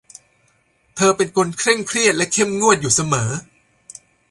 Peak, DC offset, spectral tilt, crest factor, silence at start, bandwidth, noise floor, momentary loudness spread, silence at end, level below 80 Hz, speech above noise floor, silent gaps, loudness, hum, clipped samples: 0 dBFS; under 0.1%; -3 dB/octave; 20 dB; 0.95 s; 11.5 kHz; -61 dBFS; 7 LU; 0.85 s; -54 dBFS; 43 dB; none; -17 LUFS; none; under 0.1%